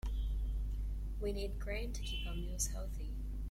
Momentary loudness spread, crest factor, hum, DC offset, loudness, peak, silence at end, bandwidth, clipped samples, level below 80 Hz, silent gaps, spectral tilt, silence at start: 5 LU; 16 dB; none; under 0.1%; -42 LUFS; -22 dBFS; 0 s; 15 kHz; under 0.1%; -40 dBFS; none; -4 dB/octave; 0.05 s